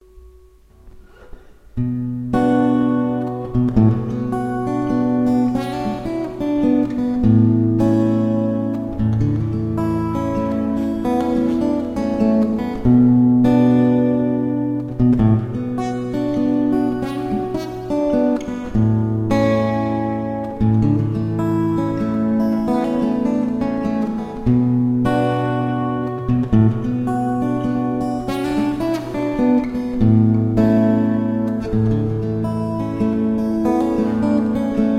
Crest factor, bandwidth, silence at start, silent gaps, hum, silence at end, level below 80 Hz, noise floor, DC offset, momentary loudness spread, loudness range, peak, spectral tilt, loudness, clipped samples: 16 dB; 10 kHz; 0.15 s; none; none; 0 s; -38 dBFS; -47 dBFS; under 0.1%; 8 LU; 4 LU; -2 dBFS; -9 dB/octave; -18 LUFS; under 0.1%